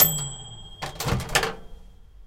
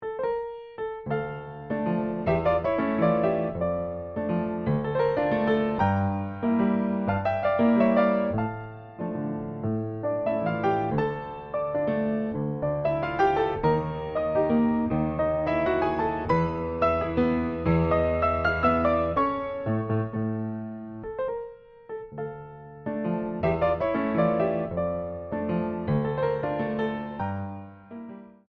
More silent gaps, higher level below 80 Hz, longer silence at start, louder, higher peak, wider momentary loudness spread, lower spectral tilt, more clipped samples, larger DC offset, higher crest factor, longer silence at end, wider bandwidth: neither; first, -42 dBFS vs -50 dBFS; about the same, 0 s vs 0 s; about the same, -26 LUFS vs -26 LUFS; first, -4 dBFS vs -10 dBFS; first, 17 LU vs 12 LU; second, -3 dB/octave vs -9.5 dB/octave; neither; neither; first, 24 dB vs 16 dB; second, 0 s vs 0.25 s; first, 17 kHz vs 6 kHz